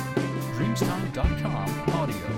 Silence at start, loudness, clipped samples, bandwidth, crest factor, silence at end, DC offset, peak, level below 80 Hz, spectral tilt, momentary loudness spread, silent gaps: 0 s; -27 LUFS; under 0.1%; 17 kHz; 16 dB; 0 s; under 0.1%; -10 dBFS; -36 dBFS; -6.5 dB/octave; 2 LU; none